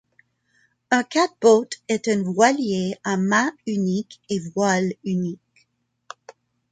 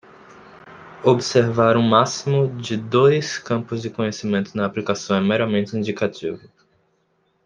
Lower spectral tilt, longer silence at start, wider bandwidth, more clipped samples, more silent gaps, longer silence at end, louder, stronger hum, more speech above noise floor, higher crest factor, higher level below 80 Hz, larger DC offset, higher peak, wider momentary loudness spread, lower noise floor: about the same, -5 dB/octave vs -5.5 dB/octave; first, 0.9 s vs 0.55 s; about the same, 9.4 kHz vs 9.8 kHz; neither; neither; second, 0.4 s vs 1.1 s; about the same, -21 LUFS vs -20 LUFS; neither; about the same, 47 dB vs 46 dB; about the same, 20 dB vs 18 dB; about the same, -68 dBFS vs -64 dBFS; neither; about the same, -4 dBFS vs -2 dBFS; about the same, 11 LU vs 9 LU; about the same, -68 dBFS vs -66 dBFS